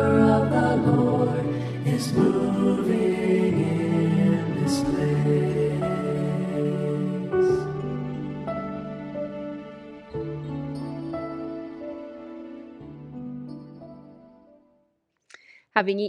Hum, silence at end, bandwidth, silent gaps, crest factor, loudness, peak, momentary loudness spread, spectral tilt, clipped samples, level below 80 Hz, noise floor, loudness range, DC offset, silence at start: none; 0 s; 13 kHz; none; 22 dB; -24 LUFS; -4 dBFS; 18 LU; -7.5 dB/octave; under 0.1%; -54 dBFS; -71 dBFS; 16 LU; under 0.1%; 0 s